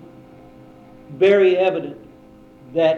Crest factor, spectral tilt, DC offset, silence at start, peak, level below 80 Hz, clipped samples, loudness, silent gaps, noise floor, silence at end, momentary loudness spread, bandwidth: 16 dB; -7 dB/octave; under 0.1%; 1.1 s; -4 dBFS; -60 dBFS; under 0.1%; -17 LUFS; none; -46 dBFS; 0 s; 19 LU; 6.6 kHz